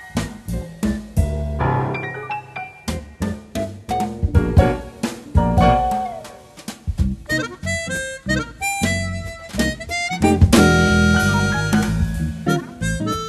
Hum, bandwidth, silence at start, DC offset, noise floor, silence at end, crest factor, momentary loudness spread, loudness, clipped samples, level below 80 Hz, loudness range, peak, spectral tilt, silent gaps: none; 13 kHz; 0 s; under 0.1%; -38 dBFS; 0 s; 20 dB; 14 LU; -20 LUFS; under 0.1%; -28 dBFS; 7 LU; 0 dBFS; -5.5 dB/octave; none